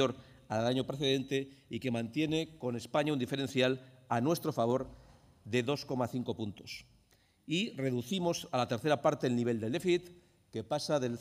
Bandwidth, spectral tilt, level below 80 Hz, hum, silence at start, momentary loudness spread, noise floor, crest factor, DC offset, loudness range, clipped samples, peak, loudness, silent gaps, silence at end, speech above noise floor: 15.5 kHz; -5.5 dB/octave; -68 dBFS; none; 0 s; 10 LU; -68 dBFS; 18 dB; under 0.1%; 3 LU; under 0.1%; -16 dBFS; -34 LUFS; none; 0 s; 35 dB